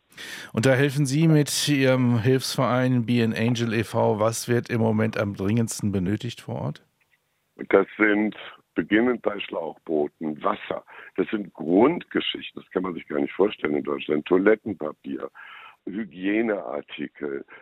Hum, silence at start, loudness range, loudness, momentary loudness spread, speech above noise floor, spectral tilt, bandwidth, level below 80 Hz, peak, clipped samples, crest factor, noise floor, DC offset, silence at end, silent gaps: none; 0.15 s; 5 LU; -24 LUFS; 14 LU; 45 dB; -5.5 dB/octave; 16 kHz; -64 dBFS; -4 dBFS; under 0.1%; 20 dB; -69 dBFS; under 0.1%; 0.05 s; none